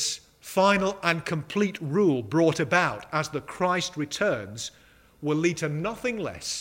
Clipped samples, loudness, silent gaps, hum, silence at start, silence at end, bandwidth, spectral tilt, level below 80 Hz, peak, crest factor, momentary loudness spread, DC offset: under 0.1%; -26 LUFS; none; none; 0 s; 0 s; 16 kHz; -4.5 dB/octave; -60 dBFS; -4 dBFS; 22 dB; 10 LU; under 0.1%